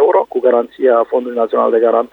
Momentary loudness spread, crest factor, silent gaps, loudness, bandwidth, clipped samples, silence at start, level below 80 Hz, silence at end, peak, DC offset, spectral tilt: 4 LU; 12 dB; none; -14 LUFS; 4.1 kHz; under 0.1%; 0 s; -64 dBFS; 0.05 s; 0 dBFS; under 0.1%; -7 dB/octave